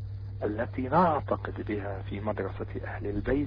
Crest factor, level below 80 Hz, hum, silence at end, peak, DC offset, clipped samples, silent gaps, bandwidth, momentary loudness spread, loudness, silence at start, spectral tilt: 16 dB; -44 dBFS; none; 0 s; -14 dBFS; under 0.1%; under 0.1%; none; 5.2 kHz; 11 LU; -31 LUFS; 0 s; -10.5 dB/octave